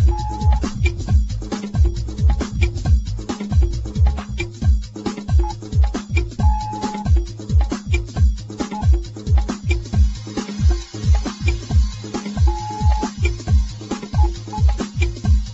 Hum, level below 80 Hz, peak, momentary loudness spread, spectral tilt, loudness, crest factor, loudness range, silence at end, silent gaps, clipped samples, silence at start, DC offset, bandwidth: none; -20 dBFS; -4 dBFS; 6 LU; -6.5 dB/octave; -21 LUFS; 14 dB; 1 LU; 0 s; none; under 0.1%; 0 s; under 0.1%; 8 kHz